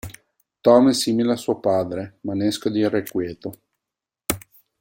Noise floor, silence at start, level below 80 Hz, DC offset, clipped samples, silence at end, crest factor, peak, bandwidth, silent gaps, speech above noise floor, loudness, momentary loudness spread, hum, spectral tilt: -87 dBFS; 0.05 s; -54 dBFS; under 0.1%; under 0.1%; 0.4 s; 20 dB; -2 dBFS; 17 kHz; none; 67 dB; -21 LUFS; 16 LU; none; -5 dB/octave